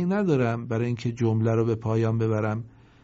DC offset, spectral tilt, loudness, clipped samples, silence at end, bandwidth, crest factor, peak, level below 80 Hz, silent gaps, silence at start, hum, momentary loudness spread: under 0.1%; -8.5 dB/octave; -25 LUFS; under 0.1%; 0.35 s; 7.6 kHz; 14 dB; -12 dBFS; -58 dBFS; none; 0 s; none; 6 LU